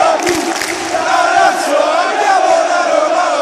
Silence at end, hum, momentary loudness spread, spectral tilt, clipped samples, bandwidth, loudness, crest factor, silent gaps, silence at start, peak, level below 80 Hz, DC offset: 0 s; none; 5 LU; -1.5 dB/octave; under 0.1%; 15 kHz; -12 LUFS; 12 dB; none; 0 s; 0 dBFS; -52 dBFS; under 0.1%